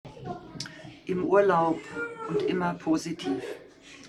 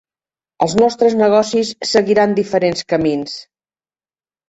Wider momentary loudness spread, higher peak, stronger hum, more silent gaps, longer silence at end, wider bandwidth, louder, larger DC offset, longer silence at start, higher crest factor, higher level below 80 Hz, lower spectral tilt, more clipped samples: first, 18 LU vs 8 LU; second, -8 dBFS vs 0 dBFS; neither; neither; second, 0 s vs 1.05 s; first, 12.5 kHz vs 8.2 kHz; second, -28 LUFS vs -15 LUFS; neither; second, 0.05 s vs 0.6 s; about the same, 20 dB vs 16 dB; second, -62 dBFS vs -54 dBFS; about the same, -6 dB/octave vs -5 dB/octave; neither